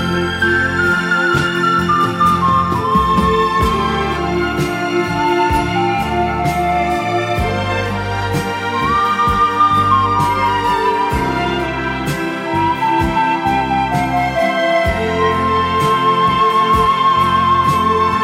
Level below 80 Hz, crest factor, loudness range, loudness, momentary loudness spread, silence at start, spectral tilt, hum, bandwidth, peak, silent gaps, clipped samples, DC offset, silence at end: -32 dBFS; 14 dB; 3 LU; -15 LUFS; 6 LU; 0 s; -5.5 dB/octave; none; 16 kHz; 0 dBFS; none; under 0.1%; under 0.1%; 0 s